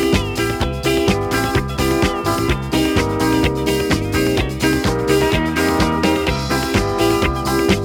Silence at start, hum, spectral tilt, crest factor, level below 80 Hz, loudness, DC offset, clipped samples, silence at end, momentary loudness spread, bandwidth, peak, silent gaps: 0 s; none; -5 dB/octave; 16 dB; -28 dBFS; -17 LUFS; under 0.1%; under 0.1%; 0 s; 3 LU; 19 kHz; -2 dBFS; none